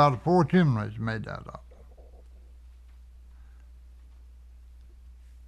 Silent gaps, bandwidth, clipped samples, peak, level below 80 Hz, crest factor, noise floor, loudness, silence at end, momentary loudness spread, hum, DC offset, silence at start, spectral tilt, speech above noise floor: none; 9.4 kHz; under 0.1%; -8 dBFS; -50 dBFS; 22 dB; -50 dBFS; -26 LUFS; 0.35 s; 21 LU; none; under 0.1%; 0 s; -8.5 dB/octave; 25 dB